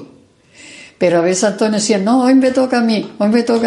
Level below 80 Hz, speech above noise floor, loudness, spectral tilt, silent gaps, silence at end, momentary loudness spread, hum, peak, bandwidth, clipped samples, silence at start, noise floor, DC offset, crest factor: -62 dBFS; 34 dB; -14 LUFS; -4.5 dB/octave; none; 0 s; 5 LU; none; 0 dBFS; 11.5 kHz; under 0.1%; 0 s; -46 dBFS; under 0.1%; 14 dB